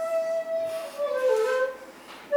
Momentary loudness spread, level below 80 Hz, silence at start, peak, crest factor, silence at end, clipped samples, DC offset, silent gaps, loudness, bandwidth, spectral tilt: 19 LU; -74 dBFS; 0 s; -12 dBFS; 14 dB; 0 s; under 0.1%; under 0.1%; none; -27 LUFS; 20 kHz; -2 dB/octave